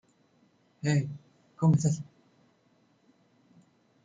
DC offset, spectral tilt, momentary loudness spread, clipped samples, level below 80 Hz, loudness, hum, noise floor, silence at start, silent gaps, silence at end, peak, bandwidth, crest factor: under 0.1%; -7 dB/octave; 20 LU; under 0.1%; -66 dBFS; -29 LUFS; none; -67 dBFS; 0.85 s; none; 2 s; -14 dBFS; 9.2 kHz; 18 dB